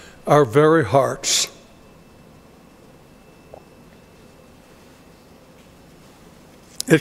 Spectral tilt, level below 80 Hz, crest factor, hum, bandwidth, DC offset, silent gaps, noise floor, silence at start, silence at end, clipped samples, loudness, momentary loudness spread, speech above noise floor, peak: -4 dB/octave; -56 dBFS; 22 dB; none; 16 kHz; under 0.1%; none; -48 dBFS; 0.25 s; 0 s; under 0.1%; -17 LUFS; 7 LU; 32 dB; 0 dBFS